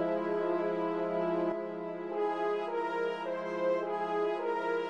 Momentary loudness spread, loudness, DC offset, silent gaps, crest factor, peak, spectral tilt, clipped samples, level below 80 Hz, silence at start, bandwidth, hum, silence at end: 4 LU; -33 LUFS; under 0.1%; none; 12 dB; -20 dBFS; -7 dB/octave; under 0.1%; -84 dBFS; 0 s; 8.4 kHz; none; 0 s